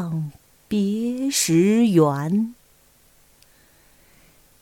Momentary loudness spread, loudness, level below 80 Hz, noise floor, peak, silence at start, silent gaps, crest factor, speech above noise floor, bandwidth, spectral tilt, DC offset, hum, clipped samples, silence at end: 13 LU; -20 LUFS; -62 dBFS; -56 dBFS; -6 dBFS; 0 s; none; 18 dB; 37 dB; 18 kHz; -5.5 dB/octave; under 0.1%; none; under 0.1%; 2.1 s